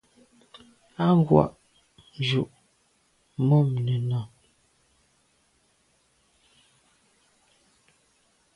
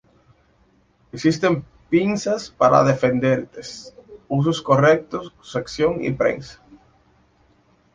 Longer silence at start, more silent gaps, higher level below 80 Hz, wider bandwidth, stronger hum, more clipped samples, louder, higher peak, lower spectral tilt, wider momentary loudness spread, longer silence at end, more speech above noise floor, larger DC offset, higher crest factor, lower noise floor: second, 1 s vs 1.15 s; neither; about the same, -58 dBFS vs -54 dBFS; first, 11 kHz vs 9.6 kHz; neither; neither; second, -24 LUFS vs -20 LUFS; about the same, -4 dBFS vs -2 dBFS; first, -8.5 dB/octave vs -6.5 dB/octave; about the same, 18 LU vs 19 LU; first, 4.3 s vs 1.4 s; first, 45 dB vs 40 dB; neither; first, 26 dB vs 20 dB; first, -67 dBFS vs -59 dBFS